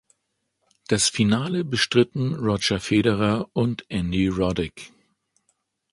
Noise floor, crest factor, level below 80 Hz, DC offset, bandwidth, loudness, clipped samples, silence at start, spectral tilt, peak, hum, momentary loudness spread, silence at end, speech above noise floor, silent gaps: -76 dBFS; 20 dB; -46 dBFS; under 0.1%; 11.5 kHz; -23 LUFS; under 0.1%; 0.9 s; -4.5 dB/octave; -4 dBFS; none; 6 LU; 1.05 s; 54 dB; none